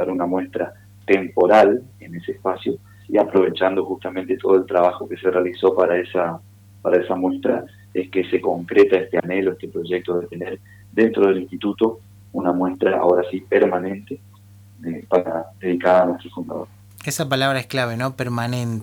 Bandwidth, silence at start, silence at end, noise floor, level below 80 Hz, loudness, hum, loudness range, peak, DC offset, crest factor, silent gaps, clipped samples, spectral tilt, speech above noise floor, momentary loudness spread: 18.5 kHz; 0 s; 0 s; -46 dBFS; -62 dBFS; -20 LUFS; none; 3 LU; -4 dBFS; under 0.1%; 16 dB; none; under 0.1%; -6 dB/octave; 27 dB; 15 LU